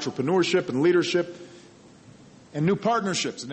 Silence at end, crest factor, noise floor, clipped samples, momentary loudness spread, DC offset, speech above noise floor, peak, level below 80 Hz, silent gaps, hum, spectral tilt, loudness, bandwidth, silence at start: 0 s; 14 dB; -50 dBFS; under 0.1%; 11 LU; under 0.1%; 26 dB; -10 dBFS; -66 dBFS; none; none; -5 dB/octave; -24 LUFS; 8.8 kHz; 0 s